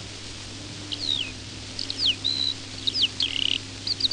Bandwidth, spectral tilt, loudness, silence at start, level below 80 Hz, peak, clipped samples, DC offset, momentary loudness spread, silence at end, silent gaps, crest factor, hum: 11 kHz; -2 dB/octave; -25 LUFS; 0 s; -52 dBFS; -10 dBFS; under 0.1%; under 0.1%; 14 LU; 0 s; none; 18 dB; none